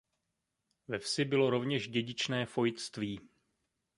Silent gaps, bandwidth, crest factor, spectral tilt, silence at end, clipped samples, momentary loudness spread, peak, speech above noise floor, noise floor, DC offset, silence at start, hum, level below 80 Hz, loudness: none; 11.5 kHz; 20 dB; -5 dB/octave; 0.7 s; under 0.1%; 11 LU; -16 dBFS; 52 dB; -85 dBFS; under 0.1%; 0.9 s; none; -70 dBFS; -34 LUFS